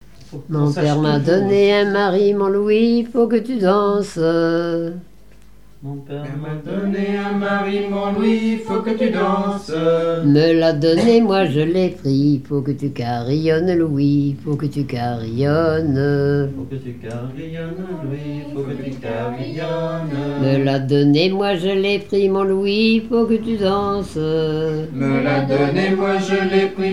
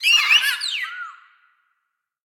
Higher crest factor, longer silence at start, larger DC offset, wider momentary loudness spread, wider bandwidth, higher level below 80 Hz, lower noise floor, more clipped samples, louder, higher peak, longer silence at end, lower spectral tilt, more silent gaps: about the same, 16 dB vs 18 dB; first, 0.3 s vs 0 s; first, 0.8% vs under 0.1%; second, 13 LU vs 21 LU; second, 12 kHz vs 17.5 kHz; first, -50 dBFS vs under -90 dBFS; second, -47 dBFS vs -77 dBFS; neither; about the same, -18 LUFS vs -17 LUFS; about the same, -2 dBFS vs -4 dBFS; second, 0 s vs 1.1 s; first, -7.5 dB/octave vs 6 dB/octave; neither